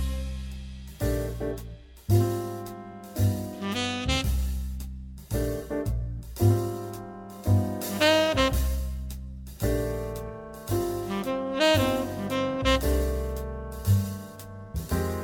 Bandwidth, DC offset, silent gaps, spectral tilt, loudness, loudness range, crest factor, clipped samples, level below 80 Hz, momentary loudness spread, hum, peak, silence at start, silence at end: 17.5 kHz; under 0.1%; none; -5.5 dB/octave; -28 LUFS; 4 LU; 22 dB; under 0.1%; -34 dBFS; 16 LU; none; -6 dBFS; 0 s; 0 s